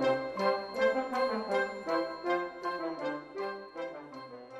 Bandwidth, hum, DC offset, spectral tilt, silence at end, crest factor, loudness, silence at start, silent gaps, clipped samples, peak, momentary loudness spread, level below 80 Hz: 12 kHz; none; under 0.1%; -5 dB/octave; 0 s; 18 dB; -33 LUFS; 0 s; none; under 0.1%; -16 dBFS; 11 LU; -70 dBFS